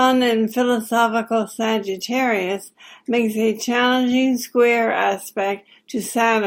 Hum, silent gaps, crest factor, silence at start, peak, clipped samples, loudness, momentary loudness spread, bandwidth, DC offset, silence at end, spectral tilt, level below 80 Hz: none; none; 16 dB; 0 s; -2 dBFS; under 0.1%; -20 LUFS; 9 LU; 17 kHz; under 0.1%; 0 s; -3.5 dB/octave; -68 dBFS